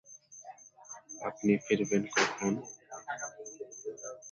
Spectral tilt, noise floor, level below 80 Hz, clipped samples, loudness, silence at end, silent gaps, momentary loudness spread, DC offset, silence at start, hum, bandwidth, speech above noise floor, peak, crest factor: -4 dB/octave; -52 dBFS; -74 dBFS; under 0.1%; -33 LUFS; 0 s; none; 20 LU; under 0.1%; 0.05 s; none; 7.6 kHz; 22 dB; -14 dBFS; 20 dB